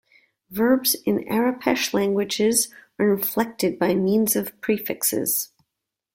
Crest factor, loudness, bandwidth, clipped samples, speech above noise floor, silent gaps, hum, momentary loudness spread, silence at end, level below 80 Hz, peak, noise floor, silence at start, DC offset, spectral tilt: 18 dB; -22 LUFS; 16.5 kHz; under 0.1%; 61 dB; none; none; 5 LU; 0.7 s; -62 dBFS; -6 dBFS; -83 dBFS; 0.5 s; under 0.1%; -3.5 dB/octave